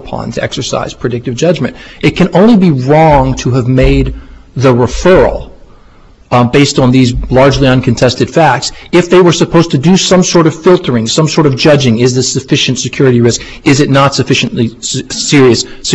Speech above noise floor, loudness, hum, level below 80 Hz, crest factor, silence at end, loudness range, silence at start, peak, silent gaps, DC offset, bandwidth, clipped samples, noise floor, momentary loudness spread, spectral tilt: 31 dB; -9 LUFS; none; -26 dBFS; 8 dB; 0 s; 2 LU; 0 s; 0 dBFS; none; under 0.1%; 9.8 kHz; 0.3%; -39 dBFS; 9 LU; -5 dB/octave